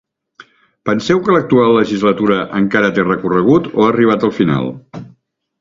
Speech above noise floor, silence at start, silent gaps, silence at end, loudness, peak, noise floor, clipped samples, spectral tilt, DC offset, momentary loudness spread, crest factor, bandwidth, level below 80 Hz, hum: 39 dB; 0.85 s; none; 0.55 s; -13 LUFS; 0 dBFS; -52 dBFS; under 0.1%; -7 dB/octave; under 0.1%; 11 LU; 14 dB; 7.6 kHz; -50 dBFS; none